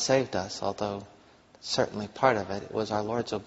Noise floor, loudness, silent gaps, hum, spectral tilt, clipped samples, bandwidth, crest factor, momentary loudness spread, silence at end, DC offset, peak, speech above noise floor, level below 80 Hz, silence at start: -57 dBFS; -29 LUFS; none; none; -3.5 dB/octave; under 0.1%; 8 kHz; 22 dB; 8 LU; 0 s; under 0.1%; -8 dBFS; 28 dB; -60 dBFS; 0 s